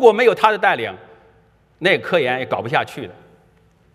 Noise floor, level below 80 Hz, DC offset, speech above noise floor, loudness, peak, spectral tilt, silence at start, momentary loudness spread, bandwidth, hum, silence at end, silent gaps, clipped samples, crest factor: -55 dBFS; -64 dBFS; under 0.1%; 38 dB; -18 LUFS; 0 dBFS; -5 dB/octave; 0 s; 17 LU; 13.5 kHz; none; 0.8 s; none; under 0.1%; 18 dB